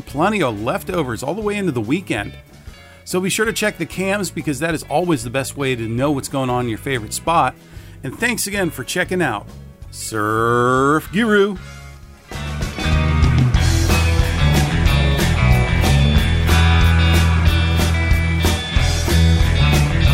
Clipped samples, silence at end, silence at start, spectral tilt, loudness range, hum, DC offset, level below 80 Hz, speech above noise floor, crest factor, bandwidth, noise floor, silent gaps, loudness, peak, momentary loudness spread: under 0.1%; 0 s; 0.05 s; -5.5 dB/octave; 6 LU; none; under 0.1%; -24 dBFS; 19 dB; 14 dB; 16 kHz; -38 dBFS; none; -17 LUFS; -2 dBFS; 9 LU